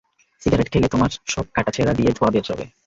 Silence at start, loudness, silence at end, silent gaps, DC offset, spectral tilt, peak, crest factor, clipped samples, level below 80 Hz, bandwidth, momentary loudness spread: 0.45 s; -20 LUFS; 0.2 s; none; under 0.1%; -6 dB/octave; -4 dBFS; 16 dB; under 0.1%; -38 dBFS; 7.8 kHz; 7 LU